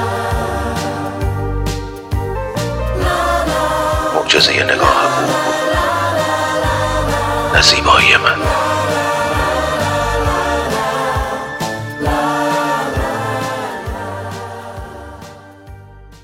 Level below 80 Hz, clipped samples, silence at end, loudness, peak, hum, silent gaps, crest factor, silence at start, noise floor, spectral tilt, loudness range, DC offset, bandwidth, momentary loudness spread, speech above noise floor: -28 dBFS; under 0.1%; 0.05 s; -15 LUFS; 0 dBFS; none; none; 16 dB; 0 s; -37 dBFS; -4 dB/octave; 7 LU; under 0.1%; 16.5 kHz; 14 LU; 25 dB